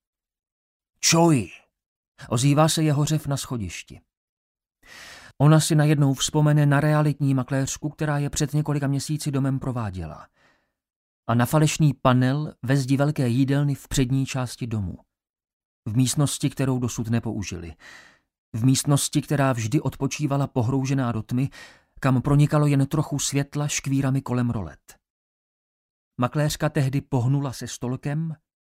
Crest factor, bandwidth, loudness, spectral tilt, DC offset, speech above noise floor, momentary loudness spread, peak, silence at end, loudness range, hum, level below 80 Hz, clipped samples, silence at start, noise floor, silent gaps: 20 dB; 16 kHz; -23 LUFS; -5.5 dB/octave; under 0.1%; 42 dB; 12 LU; -4 dBFS; 0.25 s; 6 LU; none; -48 dBFS; under 0.1%; 1 s; -64 dBFS; 1.86-2.15 s, 4.17-4.55 s, 10.96-11.23 s, 15.29-15.34 s, 15.53-15.83 s, 18.38-18.52 s, 25.10-26.11 s